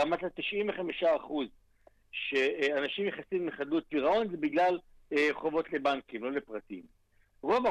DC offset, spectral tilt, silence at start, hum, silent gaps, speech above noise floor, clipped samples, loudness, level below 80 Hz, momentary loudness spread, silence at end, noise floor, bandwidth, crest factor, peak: under 0.1%; -5 dB/octave; 0 s; none; none; 33 dB; under 0.1%; -32 LUFS; -66 dBFS; 10 LU; 0 s; -64 dBFS; 10.5 kHz; 14 dB; -18 dBFS